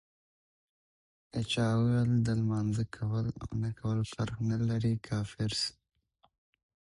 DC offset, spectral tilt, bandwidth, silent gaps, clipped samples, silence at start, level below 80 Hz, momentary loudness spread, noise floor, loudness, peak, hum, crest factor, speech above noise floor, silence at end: under 0.1%; -6.5 dB/octave; 11.5 kHz; none; under 0.1%; 1.35 s; -56 dBFS; 8 LU; under -90 dBFS; -32 LUFS; -18 dBFS; none; 14 dB; over 59 dB; 1.2 s